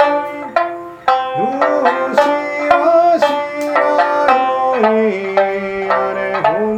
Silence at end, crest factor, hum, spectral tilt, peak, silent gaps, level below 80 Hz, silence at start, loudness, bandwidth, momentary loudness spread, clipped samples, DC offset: 0 s; 14 dB; none; -5 dB/octave; 0 dBFS; none; -56 dBFS; 0 s; -15 LUFS; 14 kHz; 7 LU; under 0.1%; under 0.1%